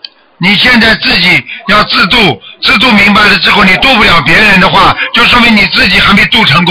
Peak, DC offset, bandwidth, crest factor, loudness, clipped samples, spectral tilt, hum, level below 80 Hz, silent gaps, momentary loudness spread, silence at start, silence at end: 0 dBFS; under 0.1%; 16.5 kHz; 6 dB; -4 LUFS; under 0.1%; -4.5 dB/octave; none; -28 dBFS; none; 5 LU; 0.4 s; 0 s